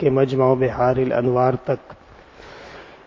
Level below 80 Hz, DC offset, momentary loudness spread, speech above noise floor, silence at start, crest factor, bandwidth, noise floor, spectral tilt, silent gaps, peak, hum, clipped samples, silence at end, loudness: -48 dBFS; under 0.1%; 22 LU; 26 dB; 0 s; 18 dB; 7.2 kHz; -44 dBFS; -9 dB/octave; none; -2 dBFS; none; under 0.1%; 0.1 s; -19 LUFS